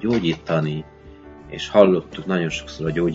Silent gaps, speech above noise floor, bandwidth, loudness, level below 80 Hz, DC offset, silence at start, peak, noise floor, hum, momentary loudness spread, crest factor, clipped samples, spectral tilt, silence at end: none; 22 dB; 7.8 kHz; -21 LUFS; -46 dBFS; under 0.1%; 0 s; 0 dBFS; -42 dBFS; none; 15 LU; 22 dB; under 0.1%; -6.5 dB/octave; 0 s